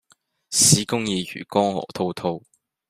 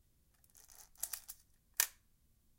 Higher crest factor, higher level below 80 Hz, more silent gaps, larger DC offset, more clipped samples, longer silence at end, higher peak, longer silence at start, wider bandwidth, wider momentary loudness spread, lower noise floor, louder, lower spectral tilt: second, 24 dB vs 38 dB; first, -58 dBFS vs -72 dBFS; neither; neither; neither; second, 0.5 s vs 0.7 s; first, 0 dBFS vs -8 dBFS; about the same, 0.5 s vs 0.55 s; about the same, 15.5 kHz vs 17 kHz; second, 13 LU vs 22 LU; second, -61 dBFS vs -72 dBFS; first, -21 LUFS vs -39 LUFS; first, -3 dB/octave vs 2.5 dB/octave